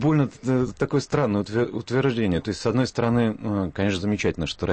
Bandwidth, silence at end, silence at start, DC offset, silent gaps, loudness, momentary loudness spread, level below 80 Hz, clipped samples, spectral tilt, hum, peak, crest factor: 8.8 kHz; 0 s; 0 s; under 0.1%; none; -24 LUFS; 4 LU; -48 dBFS; under 0.1%; -6.5 dB/octave; none; -10 dBFS; 14 dB